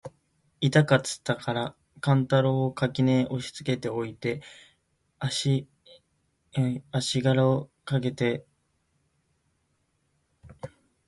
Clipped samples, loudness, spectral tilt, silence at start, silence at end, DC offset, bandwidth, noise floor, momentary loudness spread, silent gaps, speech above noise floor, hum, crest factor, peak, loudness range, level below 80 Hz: under 0.1%; -27 LUFS; -6 dB/octave; 0.05 s; 0.4 s; under 0.1%; 11.5 kHz; -73 dBFS; 13 LU; none; 47 dB; none; 22 dB; -6 dBFS; 7 LU; -62 dBFS